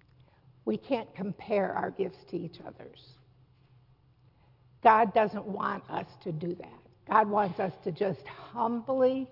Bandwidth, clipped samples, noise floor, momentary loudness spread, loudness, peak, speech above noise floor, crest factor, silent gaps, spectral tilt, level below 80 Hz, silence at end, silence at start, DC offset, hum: 5.8 kHz; under 0.1%; -63 dBFS; 18 LU; -30 LUFS; -8 dBFS; 33 dB; 24 dB; none; -9 dB/octave; -70 dBFS; 0.05 s; 0.65 s; under 0.1%; none